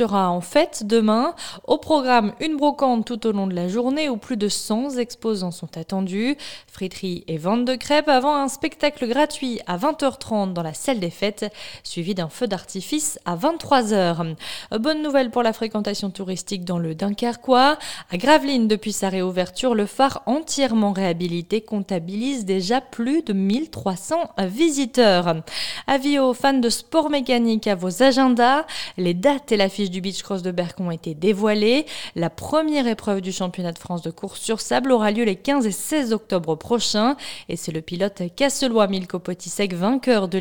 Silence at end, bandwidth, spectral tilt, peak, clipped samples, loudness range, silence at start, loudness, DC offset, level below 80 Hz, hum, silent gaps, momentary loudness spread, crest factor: 0 s; 19.5 kHz; -4.5 dB/octave; -2 dBFS; under 0.1%; 5 LU; 0 s; -22 LUFS; 0.5%; -56 dBFS; none; none; 10 LU; 18 dB